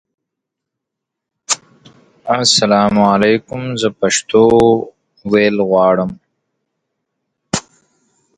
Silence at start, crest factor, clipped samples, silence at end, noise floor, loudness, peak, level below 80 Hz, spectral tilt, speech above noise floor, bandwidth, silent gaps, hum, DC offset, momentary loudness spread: 1.5 s; 16 dB; under 0.1%; 0.8 s; -80 dBFS; -14 LUFS; 0 dBFS; -48 dBFS; -4 dB/octave; 68 dB; 10.5 kHz; none; none; under 0.1%; 12 LU